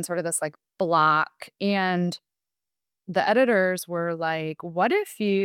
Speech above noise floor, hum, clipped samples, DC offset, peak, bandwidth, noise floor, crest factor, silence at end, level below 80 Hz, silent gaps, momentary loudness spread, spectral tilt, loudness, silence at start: 66 dB; none; under 0.1%; under 0.1%; -8 dBFS; 17.5 kHz; -90 dBFS; 18 dB; 0 s; -76 dBFS; none; 10 LU; -4.5 dB/octave; -24 LUFS; 0 s